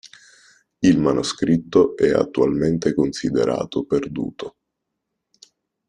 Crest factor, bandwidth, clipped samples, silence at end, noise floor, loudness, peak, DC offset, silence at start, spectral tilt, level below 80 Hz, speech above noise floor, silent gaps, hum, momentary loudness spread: 18 dB; 10.5 kHz; under 0.1%; 1.4 s; -79 dBFS; -20 LUFS; -4 dBFS; under 0.1%; 0.8 s; -6 dB/octave; -50 dBFS; 60 dB; none; none; 11 LU